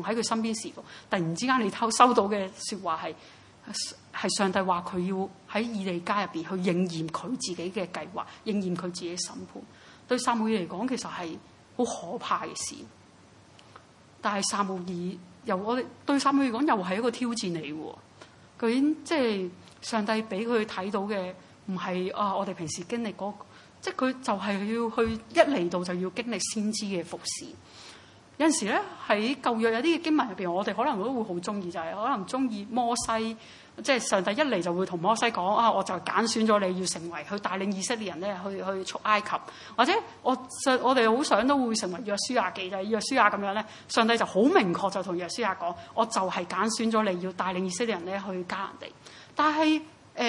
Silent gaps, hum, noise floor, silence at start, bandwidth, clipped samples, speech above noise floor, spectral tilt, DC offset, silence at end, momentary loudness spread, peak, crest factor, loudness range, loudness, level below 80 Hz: none; none; -55 dBFS; 0 s; 11.5 kHz; under 0.1%; 27 dB; -4 dB/octave; under 0.1%; 0 s; 12 LU; -4 dBFS; 24 dB; 6 LU; -28 LUFS; -68 dBFS